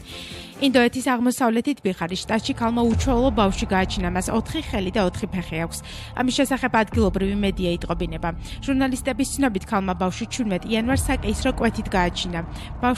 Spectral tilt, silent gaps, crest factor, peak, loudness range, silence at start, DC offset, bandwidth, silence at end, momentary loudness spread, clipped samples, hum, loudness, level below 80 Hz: -5 dB/octave; none; 16 dB; -6 dBFS; 3 LU; 0 s; under 0.1%; 14 kHz; 0 s; 8 LU; under 0.1%; none; -23 LUFS; -34 dBFS